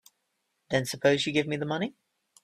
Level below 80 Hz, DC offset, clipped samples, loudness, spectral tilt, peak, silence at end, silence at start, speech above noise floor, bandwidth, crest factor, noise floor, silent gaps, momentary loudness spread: -66 dBFS; under 0.1%; under 0.1%; -28 LUFS; -4.5 dB/octave; -10 dBFS; 0.5 s; 0.7 s; 51 dB; 15 kHz; 20 dB; -78 dBFS; none; 8 LU